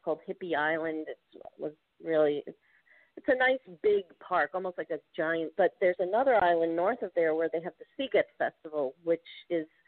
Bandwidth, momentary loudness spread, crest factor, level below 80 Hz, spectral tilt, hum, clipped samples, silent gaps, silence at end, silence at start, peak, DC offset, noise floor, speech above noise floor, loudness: 4.5 kHz; 13 LU; 16 dB; -72 dBFS; -2.5 dB/octave; none; under 0.1%; none; 0.2 s; 0.05 s; -14 dBFS; under 0.1%; -64 dBFS; 34 dB; -30 LUFS